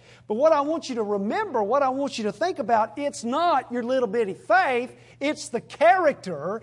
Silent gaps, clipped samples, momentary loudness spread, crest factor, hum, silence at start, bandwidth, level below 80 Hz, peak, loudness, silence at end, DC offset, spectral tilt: none; under 0.1%; 9 LU; 16 dB; none; 0.3 s; 11.5 kHz; -70 dBFS; -8 dBFS; -24 LUFS; 0.05 s; under 0.1%; -4.5 dB/octave